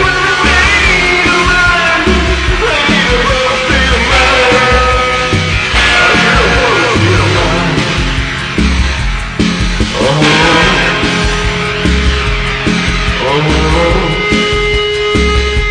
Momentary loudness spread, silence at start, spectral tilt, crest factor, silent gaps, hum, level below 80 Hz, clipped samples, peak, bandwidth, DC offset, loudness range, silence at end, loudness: 6 LU; 0 s; -4 dB/octave; 10 dB; none; none; -18 dBFS; under 0.1%; 0 dBFS; 10 kHz; under 0.1%; 3 LU; 0 s; -9 LUFS